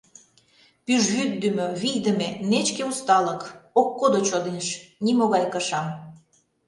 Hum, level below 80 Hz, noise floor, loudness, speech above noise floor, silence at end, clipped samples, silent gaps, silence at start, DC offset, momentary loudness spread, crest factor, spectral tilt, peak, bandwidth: none; -68 dBFS; -60 dBFS; -23 LUFS; 37 dB; 0.5 s; under 0.1%; none; 0.9 s; under 0.1%; 8 LU; 18 dB; -4 dB/octave; -6 dBFS; 11.5 kHz